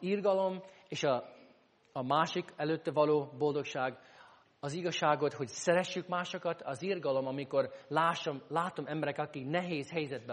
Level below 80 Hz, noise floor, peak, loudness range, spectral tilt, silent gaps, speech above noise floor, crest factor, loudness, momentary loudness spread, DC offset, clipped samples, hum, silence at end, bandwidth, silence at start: -80 dBFS; -65 dBFS; -14 dBFS; 1 LU; -5 dB/octave; none; 31 dB; 20 dB; -34 LUFS; 8 LU; under 0.1%; under 0.1%; none; 0 s; 10 kHz; 0 s